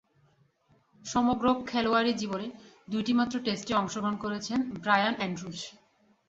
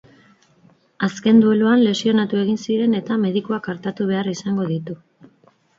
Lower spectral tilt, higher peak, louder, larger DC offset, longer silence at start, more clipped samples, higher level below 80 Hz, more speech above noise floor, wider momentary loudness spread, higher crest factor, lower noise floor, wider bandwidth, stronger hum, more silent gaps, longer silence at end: second, -4.5 dB/octave vs -6.5 dB/octave; second, -8 dBFS vs -4 dBFS; second, -29 LUFS vs -19 LUFS; neither; about the same, 1.05 s vs 1 s; neither; about the same, -62 dBFS vs -64 dBFS; about the same, 38 dB vs 38 dB; about the same, 12 LU vs 11 LU; first, 22 dB vs 16 dB; first, -67 dBFS vs -57 dBFS; about the same, 8 kHz vs 7.6 kHz; neither; neither; second, 0.6 s vs 0.85 s